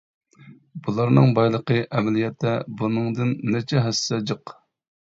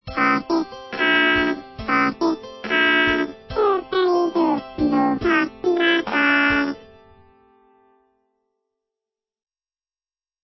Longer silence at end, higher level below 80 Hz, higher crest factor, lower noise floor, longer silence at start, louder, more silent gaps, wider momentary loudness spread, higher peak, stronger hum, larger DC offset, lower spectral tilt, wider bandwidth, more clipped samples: second, 0.5 s vs 3.65 s; second, -60 dBFS vs -48 dBFS; about the same, 18 dB vs 18 dB; second, -49 dBFS vs under -90 dBFS; first, 0.45 s vs 0.05 s; second, -22 LUFS vs -19 LUFS; neither; first, 13 LU vs 8 LU; about the same, -4 dBFS vs -4 dBFS; neither; neither; about the same, -6.5 dB/octave vs -5.5 dB/octave; first, 7.8 kHz vs 6 kHz; neither